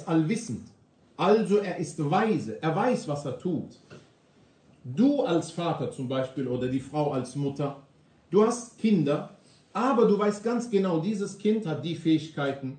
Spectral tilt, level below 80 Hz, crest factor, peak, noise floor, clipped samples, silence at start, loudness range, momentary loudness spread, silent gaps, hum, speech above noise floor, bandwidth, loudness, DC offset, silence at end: -6.5 dB/octave; -68 dBFS; 18 dB; -8 dBFS; -60 dBFS; under 0.1%; 0 s; 4 LU; 10 LU; none; none; 34 dB; 9.4 kHz; -27 LUFS; under 0.1%; 0 s